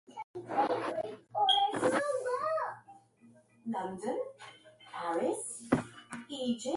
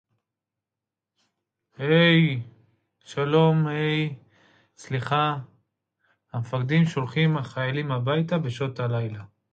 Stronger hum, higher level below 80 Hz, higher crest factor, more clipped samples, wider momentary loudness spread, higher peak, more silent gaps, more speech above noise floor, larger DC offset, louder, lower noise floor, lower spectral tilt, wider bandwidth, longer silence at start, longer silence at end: neither; about the same, -70 dBFS vs -66 dBFS; first, 24 dB vs 18 dB; neither; first, 18 LU vs 15 LU; second, -12 dBFS vs -8 dBFS; first, 0.24-0.34 s vs none; second, 28 dB vs 65 dB; neither; second, -33 LUFS vs -24 LUFS; second, -62 dBFS vs -88 dBFS; second, -3.5 dB/octave vs -7.5 dB/octave; first, 11.5 kHz vs 7.8 kHz; second, 0.1 s vs 1.8 s; second, 0 s vs 0.3 s